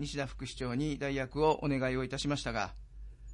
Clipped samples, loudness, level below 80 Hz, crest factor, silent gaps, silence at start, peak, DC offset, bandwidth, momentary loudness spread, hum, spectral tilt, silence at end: under 0.1%; -34 LUFS; -48 dBFS; 18 dB; none; 0 s; -16 dBFS; under 0.1%; 11 kHz; 12 LU; none; -5.5 dB/octave; 0 s